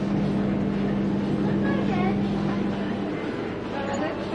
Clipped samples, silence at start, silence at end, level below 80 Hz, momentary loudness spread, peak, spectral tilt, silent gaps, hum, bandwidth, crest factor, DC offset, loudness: under 0.1%; 0 s; 0 s; -46 dBFS; 6 LU; -12 dBFS; -8 dB/octave; none; none; 7.6 kHz; 12 dB; under 0.1%; -26 LUFS